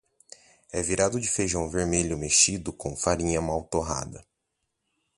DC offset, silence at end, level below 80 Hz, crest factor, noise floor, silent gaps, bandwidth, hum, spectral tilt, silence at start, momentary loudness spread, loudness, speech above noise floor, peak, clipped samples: under 0.1%; 0.95 s; -44 dBFS; 22 dB; -80 dBFS; none; 11.5 kHz; none; -3 dB/octave; 0.7 s; 13 LU; -25 LUFS; 53 dB; -6 dBFS; under 0.1%